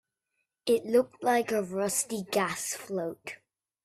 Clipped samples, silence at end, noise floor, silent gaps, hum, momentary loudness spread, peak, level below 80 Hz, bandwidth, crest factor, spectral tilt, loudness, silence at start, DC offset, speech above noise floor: under 0.1%; 0.5 s; -82 dBFS; none; none; 12 LU; -12 dBFS; -72 dBFS; 16 kHz; 18 dB; -3.5 dB/octave; -29 LUFS; 0.65 s; under 0.1%; 53 dB